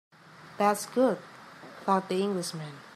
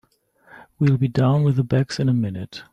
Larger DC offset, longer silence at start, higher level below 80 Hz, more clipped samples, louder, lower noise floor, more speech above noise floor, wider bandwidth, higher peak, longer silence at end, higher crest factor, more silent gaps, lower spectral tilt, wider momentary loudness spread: neither; second, 0.4 s vs 0.8 s; second, -82 dBFS vs -54 dBFS; neither; second, -29 LUFS vs -20 LUFS; second, -48 dBFS vs -56 dBFS; second, 20 dB vs 37 dB; first, 15.5 kHz vs 9 kHz; about the same, -10 dBFS vs -8 dBFS; about the same, 0.05 s vs 0.1 s; first, 20 dB vs 14 dB; neither; second, -5 dB/octave vs -8 dB/octave; first, 21 LU vs 6 LU